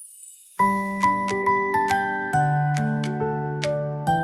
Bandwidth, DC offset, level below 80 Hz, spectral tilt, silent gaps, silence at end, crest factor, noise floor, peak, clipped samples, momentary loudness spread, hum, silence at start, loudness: 14 kHz; under 0.1%; -56 dBFS; -6 dB/octave; none; 0 s; 20 dB; -46 dBFS; -4 dBFS; under 0.1%; 5 LU; none; 0 s; -23 LUFS